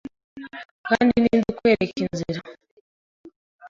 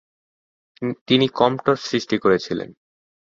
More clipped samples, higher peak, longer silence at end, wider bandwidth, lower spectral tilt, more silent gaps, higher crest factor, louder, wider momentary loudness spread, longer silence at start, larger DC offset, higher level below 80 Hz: neither; about the same, -4 dBFS vs -2 dBFS; second, 0 s vs 0.6 s; about the same, 7.4 kHz vs 7.6 kHz; about the same, -6.5 dB/octave vs -5.5 dB/octave; first, 0.65-0.84 s, 2.71-3.24 s, 3.36-3.59 s vs 1.01-1.06 s; about the same, 20 dB vs 20 dB; about the same, -22 LUFS vs -20 LUFS; first, 20 LU vs 11 LU; second, 0.35 s vs 0.8 s; neither; first, -54 dBFS vs -60 dBFS